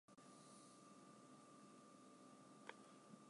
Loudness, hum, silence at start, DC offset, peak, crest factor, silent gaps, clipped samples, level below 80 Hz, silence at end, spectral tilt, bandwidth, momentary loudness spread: -64 LUFS; none; 0.1 s; under 0.1%; -34 dBFS; 30 dB; none; under 0.1%; under -90 dBFS; 0 s; -4 dB/octave; 11.5 kHz; 4 LU